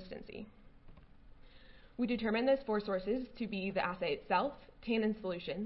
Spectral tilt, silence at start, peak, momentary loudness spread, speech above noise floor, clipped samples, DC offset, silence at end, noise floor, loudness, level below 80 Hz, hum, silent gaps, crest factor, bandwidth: -4 dB/octave; 0 s; -20 dBFS; 16 LU; 22 dB; under 0.1%; under 0.1%; 0 s; -57 dBFS; -36 LUFS; -60 dBFS; none; none; 18 dB; 5.6 kHz